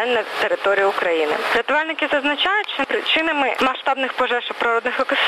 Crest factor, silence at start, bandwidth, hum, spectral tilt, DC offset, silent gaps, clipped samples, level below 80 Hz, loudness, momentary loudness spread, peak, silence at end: 12 dB; 0 s; 13.5 kHz; none; -2.5 dB/octave; under 0.1%; none; under 0.1%; -60 dBFS; -19 LUFS; 3 LU; -8 dBFS; 0 s